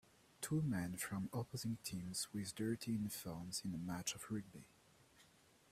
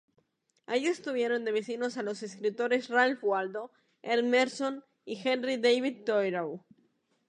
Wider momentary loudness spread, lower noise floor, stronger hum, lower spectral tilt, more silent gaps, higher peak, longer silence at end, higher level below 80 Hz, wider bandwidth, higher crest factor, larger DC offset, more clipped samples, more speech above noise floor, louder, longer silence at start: second, 6 LU vs 13 LU; about the same, -70 dBFS vs -73 dBFS; neither; about the same, -4.5 dB/octave vs -4 dB/octave; neither; second, -28 dBFS vs -12 dBFS; second, 0.45 s vs 0.7 s; first, -72 dBFS vs -86 dBFS; first, 16 kHz vs 10 kHz; about the same, 16 dB vs 20 dB; neither; neither; second, 26 dB vs 44 dB; second, -44 LUFS vs -30 LUFS; second, 0.4 s vs 0.7 s